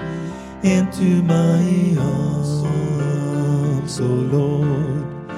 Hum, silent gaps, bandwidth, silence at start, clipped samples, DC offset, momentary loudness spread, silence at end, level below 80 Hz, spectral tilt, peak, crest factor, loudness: none; none; 12 kHz; 0 s; under 0.1%; under 0.1%; 6 LU; 0 s; -44 dBFS; -7.5 dB/octave; -4 dBFS; 14 dB; -19 LUFS